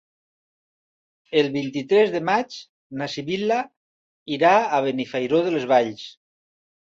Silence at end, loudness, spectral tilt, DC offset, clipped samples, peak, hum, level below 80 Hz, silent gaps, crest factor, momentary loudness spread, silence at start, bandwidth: 0.75 s; -22 LUFS; -5.5 dB/octave; under 0.1%; under 0.1%; -4 dBFS; none; -68 dBFS; 2.69-2.90 s, 3.77-4.26 s; 18 dB; 17 LU; 1.3 s; 7.6 kHz